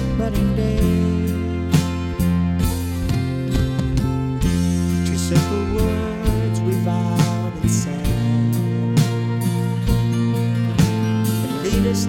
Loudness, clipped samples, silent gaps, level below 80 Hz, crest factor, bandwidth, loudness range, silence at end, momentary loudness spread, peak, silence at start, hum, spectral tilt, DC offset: -20 LUFS; under 0.1%; none; -30 dBFS; 16 dB; 17 kHz; 1 LU; 0 s; 3 LU; -2 dBFS; 0 s; none; -6.5 dB/octave; under 0.1%